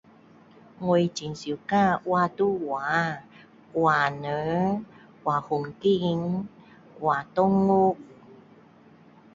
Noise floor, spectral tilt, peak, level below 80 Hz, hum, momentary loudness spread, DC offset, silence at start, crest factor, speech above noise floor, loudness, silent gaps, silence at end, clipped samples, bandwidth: -54 dBFS; -6.5 dB/octave; -8 dBFS; -62 dBFS; none; 11 LU; under 0.1%; 0.8 s; 18 dB; 29 dB; -25 LUFS; none; 1 s; under 0.1%; 7.8 kHz